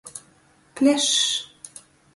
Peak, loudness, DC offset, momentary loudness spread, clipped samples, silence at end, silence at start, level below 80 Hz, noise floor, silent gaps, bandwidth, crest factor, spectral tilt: -6 dBFS; -20 LUFS; under 0.1%; 23 LU; under 0.1%; 0.5 s; 0.05 s; -68 dBFS; -58 dBFS; none; 11.5 kHz; 18 dB; -0.5 dB/octave